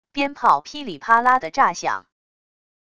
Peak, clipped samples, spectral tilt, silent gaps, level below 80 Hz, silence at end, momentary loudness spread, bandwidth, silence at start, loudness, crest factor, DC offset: -2 dBFS; under 0.1%; -3 dB/octave; none; -60 dBFS; 0.8 s; 14 LU; 11 kHz; 0.15 s; -19 LUFS; 20 dB; 0.5%